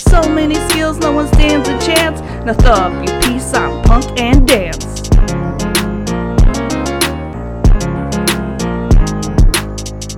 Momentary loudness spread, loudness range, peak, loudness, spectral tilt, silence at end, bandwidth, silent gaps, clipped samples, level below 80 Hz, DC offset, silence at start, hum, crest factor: 7 LU; 3 LU; 0 dBFS; -14 LUFS; -5 dB/octave; 0 s; 17.5 kHz; none; 0.5%; -14 dBFS; under 0.1%; 0 s; none; 12 dB